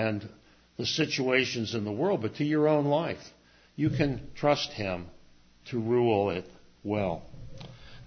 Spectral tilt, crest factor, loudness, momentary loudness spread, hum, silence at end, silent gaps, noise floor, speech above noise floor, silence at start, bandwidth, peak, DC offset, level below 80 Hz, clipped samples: -5.5 dB/octave; 20 dB; -29 LUFS; 21 LU; none; 0 s; none; -57 dBFS; 28 dB; 0 s; 6.6 kHz; -10 dBFS; under 0.1%; -54 dBFS; under 0.1%